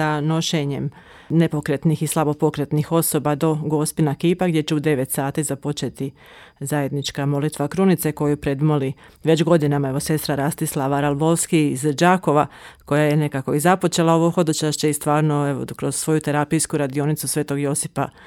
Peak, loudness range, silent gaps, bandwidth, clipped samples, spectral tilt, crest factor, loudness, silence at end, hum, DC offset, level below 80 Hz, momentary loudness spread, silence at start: -2 dBFS; 4 LU; none; 17 kHz; under 0.1%; -5.5 dB/octave; 16 dB; -20 LUFS; 0.15 s; none; under 0.1%; -52 dBFS; 7 LU; 0 s